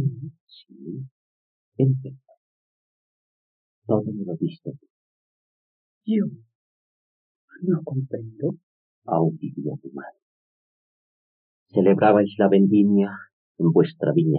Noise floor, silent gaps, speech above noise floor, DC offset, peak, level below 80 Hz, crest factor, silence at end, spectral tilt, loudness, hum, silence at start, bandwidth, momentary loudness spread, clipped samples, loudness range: under -90 dBFS; 0.40-0.47 s, 1.11-1.72 s, 2.37-3.82 s, 4.90-6.01 s, 6.55-7.48 s, 8.63-9.02 s, 10.22-11.66 s, 13.33-13.55 s; over 69 dB; under 0.1%; -4 dBFS; -74 dBFS; 20 dB; 0 s; -8.5 dB/octave; -22 LUFS; none; 0 s; 4.5 kHz; 23 LU; under 0.1%; 11 LU